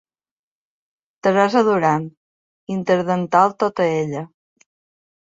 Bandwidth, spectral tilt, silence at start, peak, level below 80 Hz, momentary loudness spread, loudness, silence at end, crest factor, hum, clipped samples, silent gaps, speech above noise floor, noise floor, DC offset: 7.8 kHz; -6.5 dB/octave; 1.25 s; -2 dBFS; -64 dBFS; 12 LU; -18 LUFS; 1.05 s; 18 dB; none; under 0.1%; 2.17-2.67 s; over 72 dB; under -90 dBFS; under 0.1%